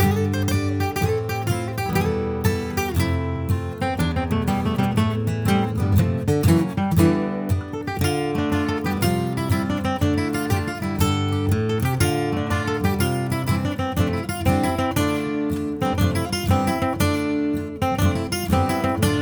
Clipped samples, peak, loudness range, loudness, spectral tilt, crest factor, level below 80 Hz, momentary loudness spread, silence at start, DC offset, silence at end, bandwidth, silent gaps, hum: under 0.1%; -4 dBFS; 2 LU; -22 LUFS; -6 dB/octave; 18 dB; -38 dBFS; 4 LU; 0 s; under 0.1%; 0 s; over 20 kHz; none; none